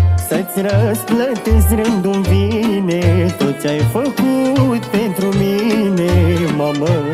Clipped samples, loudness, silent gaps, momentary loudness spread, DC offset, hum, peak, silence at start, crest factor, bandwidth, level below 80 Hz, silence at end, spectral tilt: under 0.1%; -15 LUFS; none; 3 LU; under 0.1%; none; -2 dBFS; 0 s; 12 dB; 16 kHz; -26 dBFS; 0 s; -6.5 dB/octave